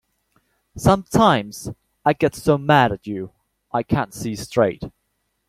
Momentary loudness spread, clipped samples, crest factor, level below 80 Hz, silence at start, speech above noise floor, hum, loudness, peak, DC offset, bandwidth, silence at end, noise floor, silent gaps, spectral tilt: 17 LU; under 0.1%; 18 dB; -46 dBFS; 0.75 s; 53 dB; none; -20 LUFS; -2 dBFS; under 0.1%; 16 kHz; 0.6 s; -72 dBFS; none; -6 dB/octave